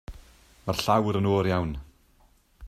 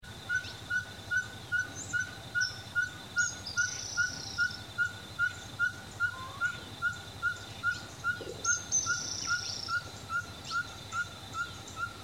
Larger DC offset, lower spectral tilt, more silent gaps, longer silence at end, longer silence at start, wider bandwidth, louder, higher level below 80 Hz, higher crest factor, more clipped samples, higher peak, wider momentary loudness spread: neither; first, -6 dB/octave vs -1 dB/octave; neither; about the same, 0 s vs 0 s; about the same, 0.1 s vs 0 s; about the same, 15.5 kHz vs 16 kHz; first, -26 LUFS vs -33 LUFS; first, -46 dBFS vs -60 dBFS; about the same, 20 dB vs 18 dB; neither; first, -8 dBFS vs -18 dBFS; first, 16 LU vs 5 LU